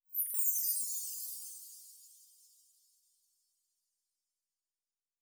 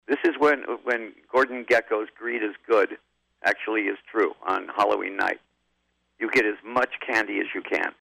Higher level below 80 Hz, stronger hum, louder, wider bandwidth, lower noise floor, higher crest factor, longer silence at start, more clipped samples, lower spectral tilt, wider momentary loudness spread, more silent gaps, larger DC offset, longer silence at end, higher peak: second, -86 dBFS vs -68 dBFS; second, none vs 60 Hz at -75 dBFS; second, -33 LUFS vs -25 LUFS; first, over 20 kHz vs 15 kHz; first, under -90 dBFS vs -73 dBFS; first, 22 dB vs 14 dB; about the same, 0.1 s vs 0.1 s; neither; second, 4.5 dB/octave vs -4 dB/octave; first, 21 LU vs 6 LU; neither; neither; first, 2.95 s vs 0.1 s; second, -20 dBFS vs -12 dBFS